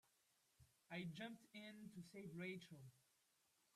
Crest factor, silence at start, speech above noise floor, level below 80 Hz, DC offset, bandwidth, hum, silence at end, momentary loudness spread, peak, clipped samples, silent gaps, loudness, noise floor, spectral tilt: 18 dB; 0.6 s; 28 dB; -90 dBFS; under 0.1%; 14.5 kHz; none; 0.75 s; 10 LU; -40 dBFS; under 0.1%; none; -56 LUFS; -83 dBFS; -5.5 dB/octave